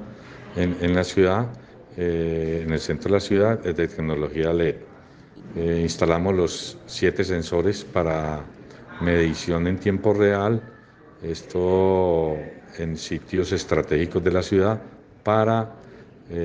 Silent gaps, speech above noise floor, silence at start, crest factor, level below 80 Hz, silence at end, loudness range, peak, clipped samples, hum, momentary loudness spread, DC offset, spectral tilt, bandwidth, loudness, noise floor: none; 26 dB; 0 s; 20 dB; -48 dBFS; 0 s; 2 LU; -4 dBFS; under 0.1%; none; 13 LU; under 0.1%; -6.5 dB/octave; 9.6 kHz; -23 LUFS; -48 dBFS